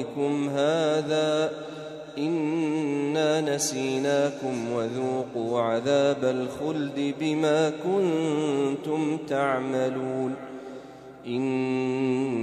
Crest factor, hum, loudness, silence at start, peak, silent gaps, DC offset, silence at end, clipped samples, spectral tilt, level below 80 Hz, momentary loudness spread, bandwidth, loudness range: 16 dB; none; -26 LUFS; 0 s; -10 dBFS; none; under 0.1%; 0 s; under 0.1%; -5 dB/octave; -70 dBFS; 8 LU; 13 kHz; 3 LU